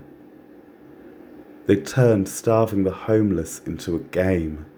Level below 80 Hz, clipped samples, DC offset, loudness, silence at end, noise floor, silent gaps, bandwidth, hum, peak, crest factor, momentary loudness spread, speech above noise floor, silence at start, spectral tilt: -46 dBFS; under 0.1%; under 0.1%; -22 LUFS; 0.1 s; -47 dBFS; none; over 20 kHz; none; -4 dBFS; 18 dB; 10 LU; 26 dB; 0 s; -7 dB/octave